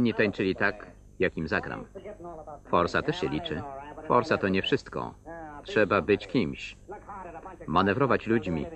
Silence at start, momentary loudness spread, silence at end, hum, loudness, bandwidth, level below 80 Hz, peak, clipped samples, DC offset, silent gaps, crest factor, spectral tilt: 0 s; 18 LU; 0 s; none; -27 LUFS; 8.8 kHz; -52 dBFS; -8 dBFS; under 0.1%; under 0.1%; none; 20 dB; -6.5 dB/octave